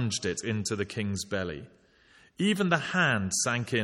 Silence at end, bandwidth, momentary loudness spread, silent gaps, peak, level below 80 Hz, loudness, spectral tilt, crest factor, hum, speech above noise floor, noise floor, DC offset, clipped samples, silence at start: 0 s; 15.5 kHz; 8 LU; none; -10 dBFS; -62 dBFS; -29 LUFS; -4 dB/octave; 20 dB; none; 31 dB; -60 dBFS; under 0.1%; under 0.1%; 0 s